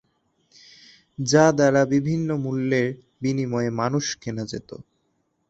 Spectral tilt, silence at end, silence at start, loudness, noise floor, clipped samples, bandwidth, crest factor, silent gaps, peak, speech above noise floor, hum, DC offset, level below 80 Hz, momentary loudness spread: -5.5 dB/octave; 0.7 s; 1.2 s; -22 LUFS; -71 dBFS; under 0.1%; 8.2 kHz; 20 dB; none; -2 dBFS; 49 dB; none; under 0.1%; -60 dBFS; 16 LU